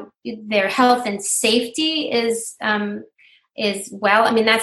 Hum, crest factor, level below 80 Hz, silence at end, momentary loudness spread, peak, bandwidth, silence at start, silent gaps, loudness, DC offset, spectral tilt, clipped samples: none; 18 dB; -66 dBFS; 0 s; 13 LU; -2 dBFS; 13 kHz; 0 s; none; -19 LUFS; under 0.1%; -2.5 dB/octave; under 0.1%